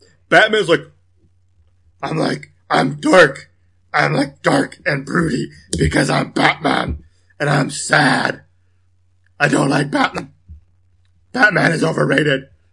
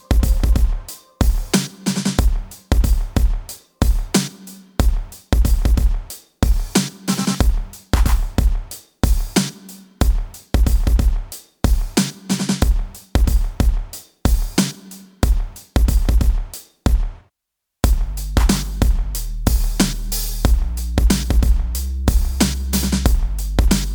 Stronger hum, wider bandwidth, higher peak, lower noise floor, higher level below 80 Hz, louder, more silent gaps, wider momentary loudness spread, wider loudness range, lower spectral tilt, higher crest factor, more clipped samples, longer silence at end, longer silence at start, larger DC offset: neither; second, 11.5 kHz vs over 20 kHz; about the same, 0 dBFS vs 0 dBFS; second, -59 dBFS vs -80 dBFS; second, -42 dBFS vs -18 dBFS; first, -16 LUFS vs -20 LUFS; neither; about the same, 12 LU vs 10 LU; about the same, 2 LU vs 2 LU; about the same, -5 dB/octave vs -5 dB/octave; about the same, 18 dB vs 18 dB; neither; first, 0.3 s vs 0 s; first, 0.3 s vs 0.1 s; first, 0.1% vs under 0.1%